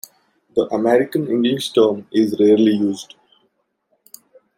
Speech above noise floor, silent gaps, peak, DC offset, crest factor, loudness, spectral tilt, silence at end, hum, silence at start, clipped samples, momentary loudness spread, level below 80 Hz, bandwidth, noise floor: 51 dB; none; -2 dBFS; under 0.1%; 16 dB; -17 LUFS; -6 dB/octave; 1.55 s; none; 0.55 s; under 0.1%; 9 LU; -64 dBFS; 16 kHz; -67 dBFS